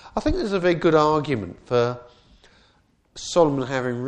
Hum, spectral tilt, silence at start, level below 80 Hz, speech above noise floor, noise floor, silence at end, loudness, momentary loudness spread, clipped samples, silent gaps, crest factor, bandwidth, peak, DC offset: none; -6 dB/octave; 0.05 s; -40 dBFS; 40 dB; -61 dBFS; 0 s; -22 LUFS; 10 LU; under 0.1%; none; 18 dB; 9.6 kHz; -4 dBFS; under 0.1%